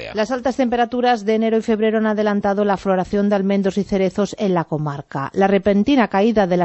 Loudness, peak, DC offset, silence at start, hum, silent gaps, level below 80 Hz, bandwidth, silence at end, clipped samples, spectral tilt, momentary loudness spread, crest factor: -18 LUFS; -2 dBFS; under 0.1%; 0 s; none; none; -48 dBFS; 8.2 kHz; 0 s; under 0.1%; -7 dB/octave; 5 LU; 16 dB